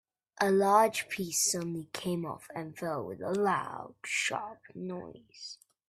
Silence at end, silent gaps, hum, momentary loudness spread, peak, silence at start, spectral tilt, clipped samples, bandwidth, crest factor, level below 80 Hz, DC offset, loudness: 0.35 s; none; none; 19 LU; -12 dBFS; 0.4 s; -3.5 dB/octave; under 0.1%; 15.5 kHz; 20 dB; -72 dBFS; under 0.1%; -31 LUFS